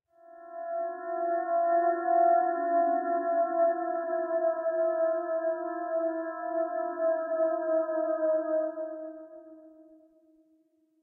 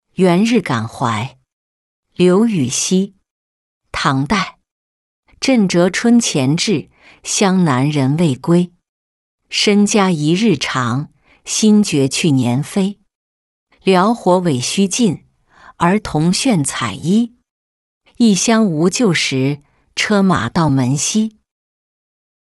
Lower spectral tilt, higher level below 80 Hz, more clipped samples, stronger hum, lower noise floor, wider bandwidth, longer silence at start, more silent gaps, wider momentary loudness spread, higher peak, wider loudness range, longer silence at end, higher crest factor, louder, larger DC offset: about the same, -5.5 dB/octave vs -5 dB/octave; second, under -90 dBFS vs -50 dBFS; neither; neither; first, -68 dBFS vs -46 dBFS; second, 1.9 kHz vs 12 kHz; about the same, 0.3 s vs 0.2 s; second, none vs 1.53-2.03 s, 3.31-3.81 s, 4.71-5.23 s, 8.89-9.38 s, 13.15-13.67 s, 17.50-18.01 s; about the same, 9 LU vs 9 LU; second, -14 dBFS vs -2 dBFS; about the same, 5 LU vs 3 LU; about the same, 1.2 s vs 1.1 s; about the same, 14 dB vs 14 dB; second, -29 LUFS vs -15 LUFS; neither